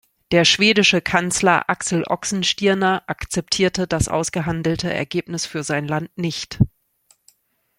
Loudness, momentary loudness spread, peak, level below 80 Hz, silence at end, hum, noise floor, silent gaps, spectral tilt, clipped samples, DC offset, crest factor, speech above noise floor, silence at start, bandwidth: -19 LUFS; 11 LU; -2 dBFS; -44 dBFS; 1.1 s; none; -60 dBFS; none; -4 dB/octave; under 0.1%; under 0.1%; 20 dB; 41 dB; 0.3 s; 16 kHz